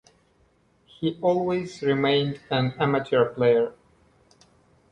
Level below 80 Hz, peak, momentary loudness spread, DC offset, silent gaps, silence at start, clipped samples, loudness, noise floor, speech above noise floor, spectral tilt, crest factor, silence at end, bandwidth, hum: -62 dBFS; -8 dBFS; 7 LU; under 0.1%; none; 1 s; under 0.1%; -24 LUFS; -63 dBFS; 40 dB; -7 dB/octave; 16 dB; 1.2 s; 9 kHz; none